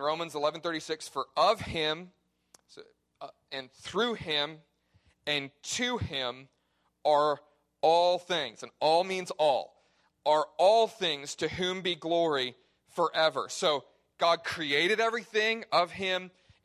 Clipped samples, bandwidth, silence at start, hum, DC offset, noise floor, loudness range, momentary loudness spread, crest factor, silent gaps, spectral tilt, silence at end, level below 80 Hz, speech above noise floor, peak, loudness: under 0.1%; 14 kHz; 0 s; none; under 0.1%; -75 dBFS; 6 LU; 12 LU; 18 dB; none; -3 dB/octave; 0.35 s; -62 dBFS; 45 dB; -12 dBFS; -29 LUFS